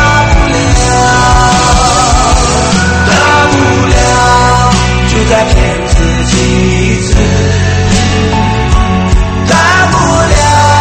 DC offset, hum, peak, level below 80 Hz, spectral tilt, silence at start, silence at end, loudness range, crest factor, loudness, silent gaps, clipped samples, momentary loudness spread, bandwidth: under 0.1%; none; 0 dBFS; -14 dBFS; -4.5 dB/octave; 0 s; 0 s; 2 LU; 6 dB; -8 LUFS; none; 1%; 4 LU; 11 kHz